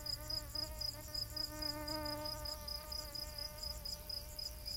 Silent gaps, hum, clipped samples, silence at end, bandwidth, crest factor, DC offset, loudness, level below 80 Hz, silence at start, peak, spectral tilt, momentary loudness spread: none; none; under 0.1%; 0 s; 17 kHz; 16 dB; under 0.1%; -42 LUFS; -52 dBFS; 0 s; -28 dBFS; -2.5 dB/octave; 4 LU